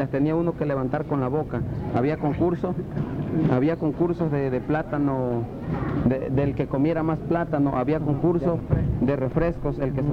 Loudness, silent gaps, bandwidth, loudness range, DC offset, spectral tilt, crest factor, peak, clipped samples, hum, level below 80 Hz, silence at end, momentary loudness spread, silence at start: -24 LUFS; none; 6 kHz; 1 LU; under 0.1%; -10.5 dB/octave; 14 dB; -8 dBFS; under 0.1%; none; -40 dBFS; 0 s; 5 LU; 0 s